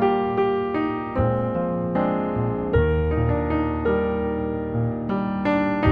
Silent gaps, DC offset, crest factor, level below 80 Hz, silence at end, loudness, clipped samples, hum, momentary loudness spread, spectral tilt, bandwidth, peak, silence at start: none; under 0.1%; 16 dB; -34 dBFS; 0 s; -23 LUFS; under 0.1%; none; 4 LU; -10 dB/octave; 5.2 kHz; -6 dBFS; 0 s